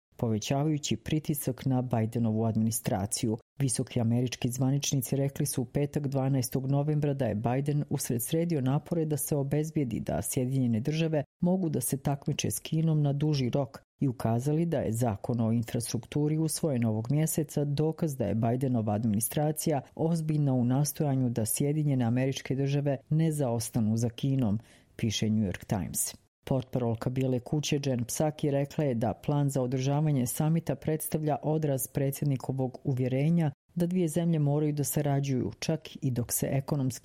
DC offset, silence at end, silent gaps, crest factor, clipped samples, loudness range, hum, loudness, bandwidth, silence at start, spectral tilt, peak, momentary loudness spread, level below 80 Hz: under 0.1%; 0.05 s; 3.42-3.56 s, 11.26-11.40 s, 13.84-13.99 s, 26.28-26.42 s, 33.54-33.69 s; 16 dB; under 0.1%; 1 LU; none; -30 LUFS; 16 kHz; 0.2 s; -6 dB/octave; -12 dBFS; 4 LU; -58 dBFS